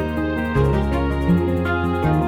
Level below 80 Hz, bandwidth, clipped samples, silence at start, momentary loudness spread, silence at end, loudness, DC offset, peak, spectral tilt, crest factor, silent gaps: -28 dBFS; 15.5 kHz; under 0.1%; 0 s; 3 LU; 0 s; -20 LUFS; under 0.1%; -6 dBFS; -8.5 dB/octave; 12 dB; none